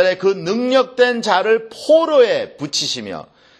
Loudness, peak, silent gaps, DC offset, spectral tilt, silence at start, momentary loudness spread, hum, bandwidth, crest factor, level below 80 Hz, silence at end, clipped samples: -16 LUFS; 0 dBFS; none; under 0.1%; -3.5 dB/octave; 0 s; 8 LU; none; 12.5 kHz; 16 dB; -66 dBFS; 0.35 s; under 0.1%